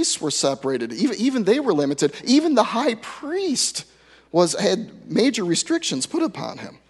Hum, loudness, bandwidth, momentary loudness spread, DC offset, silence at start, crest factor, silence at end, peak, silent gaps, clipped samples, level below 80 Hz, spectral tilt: none; -21 LUFS; 12 kHz; 7 LU; under 0.1%; 0 s; 20 dB; 0.15 s; -2 dBFS; none; under 0.1%; -66 dBFS; -3.5 dB/octave